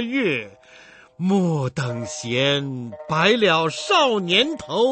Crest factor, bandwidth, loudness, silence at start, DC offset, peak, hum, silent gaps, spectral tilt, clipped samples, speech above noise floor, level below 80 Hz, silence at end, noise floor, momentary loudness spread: 18 dB; 8.8 kHz; -20 LUFS; 0 s; under 0.1%; -4 dBFS; none; none; -4.5 dB/octave; under 0.1%; 27 dB; -60 dBFS; 0 s; -48 dBFS; 10 LU